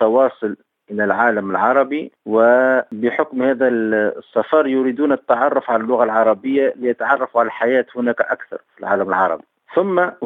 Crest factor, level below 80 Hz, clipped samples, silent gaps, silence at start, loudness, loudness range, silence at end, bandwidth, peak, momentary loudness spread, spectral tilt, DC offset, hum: 16 dB; -70 dBFS; under 0.1%; none; 0 s; -17 LUFS; 2 LU; 0 s; 4 kHz; -2 dBFS; 7 LU; -8 dB/octave; under 0.1%; none